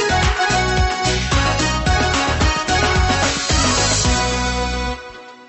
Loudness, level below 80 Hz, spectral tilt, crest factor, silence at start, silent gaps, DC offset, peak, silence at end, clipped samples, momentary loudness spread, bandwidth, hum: -17 LUFS; -24 dBFS; -3.5 dB/octave; 14 dB; 0 s; none; under 0.1%; -2 dBFS; 0.05 s; under 0.1%; 6 LU; 8.6 kHz; none